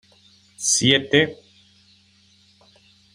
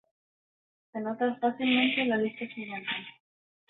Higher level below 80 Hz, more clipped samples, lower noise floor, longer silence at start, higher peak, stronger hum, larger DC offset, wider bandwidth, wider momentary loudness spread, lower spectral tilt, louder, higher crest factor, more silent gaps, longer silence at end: first, -62 dBFS vs -76 dBFS; neither; second, -57 dBFS vs under -90 dBFS; second, 0.6 s vs 0.95 s; first, -2 dBFS vs -14 dBFS; neither; neither; first, 15.5 kHz vs 4.1 kHz; second, 9 LU vs 13 LU; second, -2.5 dB/octave vs -8 dB/octave; first, -18 LUFS vs -29 LUFS; first, 24 dB vs 18 dB; neither; first, 1.8 s vs 0.6 s